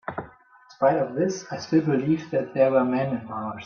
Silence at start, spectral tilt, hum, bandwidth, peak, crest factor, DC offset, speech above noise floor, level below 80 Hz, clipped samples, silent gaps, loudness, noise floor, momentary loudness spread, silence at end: 0.05 s; -7 dB/octave; none; 7 kHz; -8 dBFS; 18 dB; under 0.1%; 30 dB; -64 dBFS; under 0.1%; none; -24 LUFS; -53 dBFS; 12 LU; 0 s